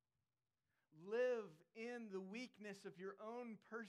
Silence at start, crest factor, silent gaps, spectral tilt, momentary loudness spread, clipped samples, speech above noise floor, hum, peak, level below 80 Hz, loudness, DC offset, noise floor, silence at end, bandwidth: 0.9 s; 16 dB; none; -5.5 dB/octave; 12 LU; under 0.1%; over 37 dB; none; -34 dBFS; under -90 dBFS; -49 LUFS; under 0.1%; under -90 dBFS; 0 s; 11 kHz